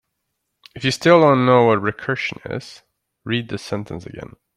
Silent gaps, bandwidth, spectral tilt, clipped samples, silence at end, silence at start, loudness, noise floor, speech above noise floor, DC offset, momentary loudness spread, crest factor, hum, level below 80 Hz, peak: none; 12.5 kHz; -6 dB/octave; under 0.1%; 0.3 s; 0.75 s; -18 LUFS; -75 dBFS; 57 dB; under 0.1%; 20 LU; 18 dB; none; -56 dBFS; -2 dBFS